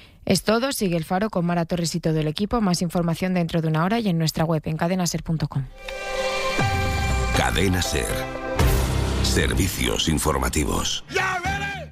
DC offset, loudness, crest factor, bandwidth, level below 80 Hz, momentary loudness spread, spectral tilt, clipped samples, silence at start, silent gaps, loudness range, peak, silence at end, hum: under 0.1%; -23 LUFS; 18 dB; 15.5 kHz; -32 dBFS; 5 LU; -4.5 dB/octave; under 0.1%; 0 s; none; 2 LU; -6 dBFS; 0 s; none